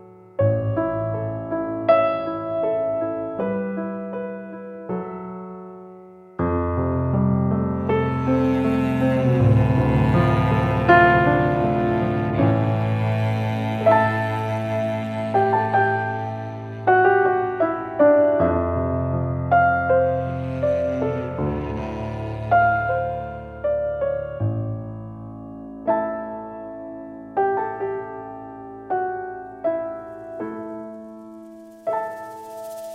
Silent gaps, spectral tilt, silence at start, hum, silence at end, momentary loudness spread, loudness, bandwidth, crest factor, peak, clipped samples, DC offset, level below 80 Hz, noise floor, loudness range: none; -9 dB/octave; 0 s; none; 0 s; 18 LU; -21 LUFS; 8.4 kHz; 20 dB; -2 dBFS; under 0.1%; under 0.1%; -42 dBFS; -43 dBFS; 11 LU